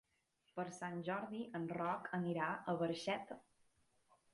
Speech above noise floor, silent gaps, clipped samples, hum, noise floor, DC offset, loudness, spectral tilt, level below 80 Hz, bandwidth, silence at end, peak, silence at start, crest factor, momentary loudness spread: 39 dB; none; under 0.1%; none; -81 dBFS; under 0.1%; -43 LUFS; -6 dB/octave; -82 dBFS; 11.5 kHz; 0.95 s; -24 dBFS; 0.55 s; 20 dB; 8 LU